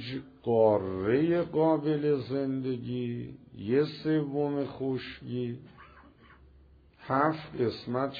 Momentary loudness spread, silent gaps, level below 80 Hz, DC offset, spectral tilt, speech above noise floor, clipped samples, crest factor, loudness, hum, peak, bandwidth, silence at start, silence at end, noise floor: 12 LU; none; -62 dBFS; under 0.1%; -9.5 dB/octave; 29 dB; under 0.1%; 18 dB; -30 LUFS; none; -12 dBFS; 5 kHz; 0 s; 0 s; -58 dBFS